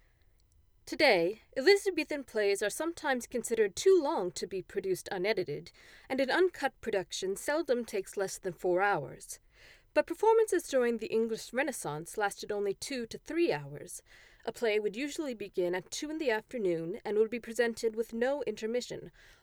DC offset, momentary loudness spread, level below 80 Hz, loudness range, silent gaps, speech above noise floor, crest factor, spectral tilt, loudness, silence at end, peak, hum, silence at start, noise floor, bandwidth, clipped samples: under 0.1%; 12 LU; -66 dBFS; 5 LU; none; 34 dB; 20 dB; -3.5 dB/octave; -32 LUFS; 0.35 s; -12 dBFS; none; 0.85 s; -66 dBFS; 19 kHz; under 0.1%